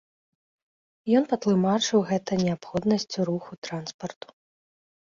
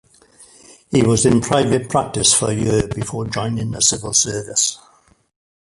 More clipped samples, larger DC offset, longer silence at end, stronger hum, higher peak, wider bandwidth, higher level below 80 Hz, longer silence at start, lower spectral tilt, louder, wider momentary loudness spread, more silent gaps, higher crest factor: neither; neither; about the same, 1 s vs 1 s; neither; second, -8 dBFS vs 0 dBFS; second, 7.6 kHz vs 11.5 kHz; second, -64 dBFS vs -42 dBFS; first, 1.05 s vs 0.4 s; first, -5.5 dB/octave vs -3.5 dB/octave; second, -25 LUFS vs -17 LUFS; first, 15 LU vs 9 LU; first, 3.58-3.62 s, 3.94-3.99 s vs none; about the same, 18 dB vs 18 dB